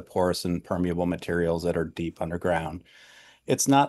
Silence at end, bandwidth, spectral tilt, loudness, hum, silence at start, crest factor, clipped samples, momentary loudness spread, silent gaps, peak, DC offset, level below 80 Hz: 0 s; 12.5 kHz; -5 dB/octave; -27 LUFS; none; 0 s; 18 dB; under 0.1%; 7 LU; none; -8 dBFS; under 0.1%; -50 dBFS